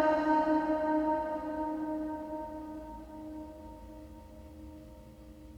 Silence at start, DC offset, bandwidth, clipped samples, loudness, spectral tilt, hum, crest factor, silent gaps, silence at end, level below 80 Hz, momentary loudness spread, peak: 0 s; under 0.1%; 8.4 kHz; under 0.1%; -33 LUFS; -7 dB/octave; none; 18 dB; none; 0 s; -54 dBFS; 23 LU; -16 dBFS